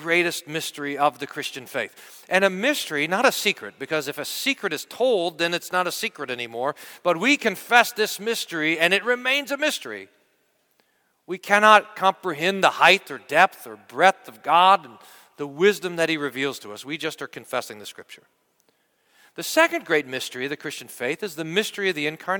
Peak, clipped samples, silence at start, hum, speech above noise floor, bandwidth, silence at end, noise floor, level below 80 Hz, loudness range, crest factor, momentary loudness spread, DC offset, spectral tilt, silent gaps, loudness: 0 dBFS; under 0.1%; 0 s; none; 44 dB; 19 kHz; 0 s; -67 dBFS; -76 dBFS; 7 LU; 22 dB; 14 LU; under 0.1%; -3 dB/octave; none; -22 LUFS